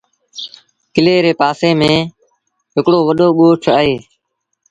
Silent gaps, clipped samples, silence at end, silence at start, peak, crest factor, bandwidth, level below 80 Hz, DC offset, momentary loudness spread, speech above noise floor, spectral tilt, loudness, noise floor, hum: none; under 0.1%; 0.7 s; 0.35 s; 0 dBFS; 14 dB; 9.2 kHz; -50 dBFS; under 0.1%; 18 LU; 59 dB; -6.5 dB/octave; -13 LUFS; -71 dBFS; none